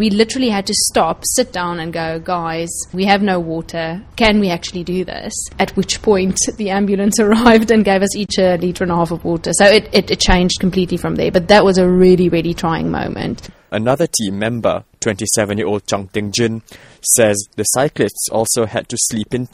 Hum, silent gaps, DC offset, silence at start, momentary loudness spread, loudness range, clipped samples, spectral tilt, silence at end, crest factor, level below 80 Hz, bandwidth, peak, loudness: none; none; under 0.1%; 0 s; 11 LU; 5 LU; under 0.1%; -4 dB/octave; 0.1 s; 16 dB; -34 dBFS; 16 kHz; 0 dBFS; -15 LUFS